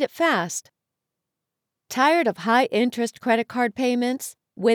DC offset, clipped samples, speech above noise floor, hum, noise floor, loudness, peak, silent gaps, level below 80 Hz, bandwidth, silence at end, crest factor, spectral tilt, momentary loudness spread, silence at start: under 0.1%; under 0.1%; 62 dB; none; -84 dBFS; -22 LUFS; -6 dBFS; none; -76 dBFS; 19 kHz; 0 s; 16 dB; -3.5 dB/octave; 12 LU; 0 s